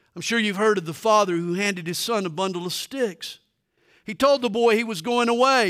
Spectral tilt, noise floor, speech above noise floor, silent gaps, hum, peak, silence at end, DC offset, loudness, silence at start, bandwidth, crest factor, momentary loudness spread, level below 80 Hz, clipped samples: -4 dB/octave; -65 dBFS; 43 dB; none; none; -6 dBFS; 0 s; under 0.1%; -22 LUFS; 0.15 s; 16 kHz; 18 dB; 9 LU; -66 dBFS; under 0.1%